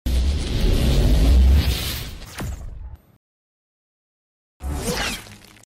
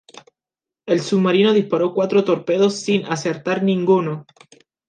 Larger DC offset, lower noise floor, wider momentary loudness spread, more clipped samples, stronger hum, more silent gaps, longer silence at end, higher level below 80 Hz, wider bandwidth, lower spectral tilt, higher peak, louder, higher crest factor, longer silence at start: neither; second, -41 dBFS vs -89 dBFS; first, 20 LU vs 7 LU; neither; neither; first, 3.16-4.60 s vs none; second, 0.3 s vs 0.65 s; first, -22 dBFS vs -70 dBFS; first, 16 kHz vs 9.6 kHz; about the same, -5 dB/octave vs -6 dB/octave; second, -8 dBFS vs -4 dBFS; second, -21 LUFS vs -18 LUFS; about the same, 12 dB vs 16 dB; second, 0.05 s vs 0.85 s